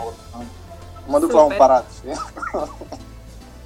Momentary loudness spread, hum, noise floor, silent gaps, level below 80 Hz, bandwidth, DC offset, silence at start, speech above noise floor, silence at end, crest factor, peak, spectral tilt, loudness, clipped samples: 24 LU; none; -39 dBFS; none; -42 dBFS; 15 kHz; under 0.1%; 0 s; 21 dB; 0 s; 20 dB; 0 dBFS; -5.5 dB/octave; -17 LUFS; under 0.1%